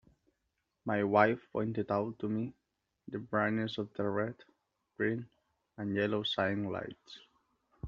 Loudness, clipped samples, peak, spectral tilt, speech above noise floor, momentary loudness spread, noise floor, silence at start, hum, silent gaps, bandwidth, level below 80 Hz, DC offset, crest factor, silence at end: -34 LUFS; under 0.1%; -10 dBFS; -4 dB/octave; 50 dB; 15 LU; -83 dBFS; 0.85 s; none; none; 7.2 kHz; -72 dBFS; under 0.1%; 26 dB; 0 s